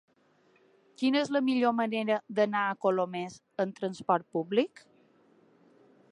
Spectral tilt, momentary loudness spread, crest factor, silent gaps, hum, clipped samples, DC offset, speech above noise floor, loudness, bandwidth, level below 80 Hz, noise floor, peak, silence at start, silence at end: -6 dB/octave; 8 LU; 20 dB; none; none; under 0.1%; under 0.1%; 37 dB; -30 LUFS; 11 kHz; -80 dBFS; -66 dBFS; -12 dBFS; 1 s; 1.45 s